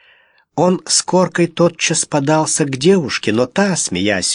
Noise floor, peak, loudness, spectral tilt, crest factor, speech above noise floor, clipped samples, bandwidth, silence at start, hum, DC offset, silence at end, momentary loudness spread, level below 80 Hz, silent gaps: -53 dBFS; 0 dBFS; -15 LUFS; -4 dB/octave; 16 dB; 38 dB; under 0.1%; 11 kHz; 0.55 s; none; under 0.1%; 0 s; 3 LU; -56 dBFS; none